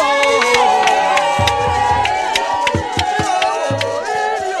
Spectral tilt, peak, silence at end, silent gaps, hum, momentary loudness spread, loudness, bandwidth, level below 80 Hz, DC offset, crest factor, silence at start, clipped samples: -3 dB/octave; 0 dBFS; 0 s; none; none; 6 LU; -15 LUFS; 15 kHz; -38 dBFS; under 0.1%; 14 dB; 0 s; under 0.1%